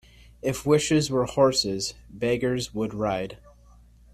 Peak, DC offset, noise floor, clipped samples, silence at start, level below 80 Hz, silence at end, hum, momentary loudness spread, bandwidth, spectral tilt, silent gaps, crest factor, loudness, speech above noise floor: -6 dBFS; under 0.1%; -53 dBFS; under 0.1%; 0.45 s; -50 dBFS; 0.8 s; none; 10 LU; 14.5 kHz; -4.5 dB/octave; none; 18 dB; -25 LUFS; 28 dB